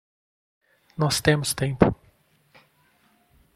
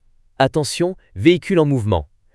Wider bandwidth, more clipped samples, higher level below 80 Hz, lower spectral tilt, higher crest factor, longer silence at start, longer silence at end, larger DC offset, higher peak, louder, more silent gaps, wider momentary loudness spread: first, 15 kHz vs 12 kHz; neither; about the same, -48 dBFS vs -44 dBFS; about the same, -5 dB/octave vs -6 dB/octave; first, 26 dB vs 18 dB; first, 1 s vs 0.4 s; first, 1.6 s vs 0.3 s; neither; about the same, 0 dBFS vs 0 dBFS; second, -23 LUFS vs -18 LUFS; neither; first, 16 LU vs 6 LU